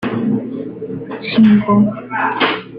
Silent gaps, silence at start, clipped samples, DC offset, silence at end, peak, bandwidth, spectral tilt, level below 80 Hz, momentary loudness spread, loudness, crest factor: none; 0 s; under 0.1%; under 0.1%; 0 s; -2 dBFS; 5.2 kHz; -9 dB/octave; -52 dBFS; 15 LU; -15 LUFS; 14 dB